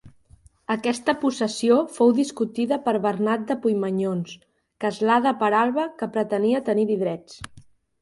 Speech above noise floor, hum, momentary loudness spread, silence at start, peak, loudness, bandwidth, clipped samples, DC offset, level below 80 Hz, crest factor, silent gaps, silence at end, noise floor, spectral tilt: 32 dB; none; 10 LU; 0.05 s; -6 dBFS; -23 LUFS; 11.5 kHz; under 0.1%; under 0.1%; -62 dBFS; 16 dB; none; 0.45 s; -55 dBFS; -5.5 dB/octave